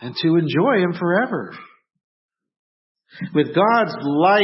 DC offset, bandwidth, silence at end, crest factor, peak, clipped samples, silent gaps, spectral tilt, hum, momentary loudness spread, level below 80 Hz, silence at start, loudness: under 0.1%; 5.8 kHz; 0 s; 16 dB; -4 dBFS; under 0.1%; 2.04-2.29 s, 2.59-2.95 s; -10.5 dB/octave; none; 10 LU; -68 dBFS; 0 s; -19 LUFS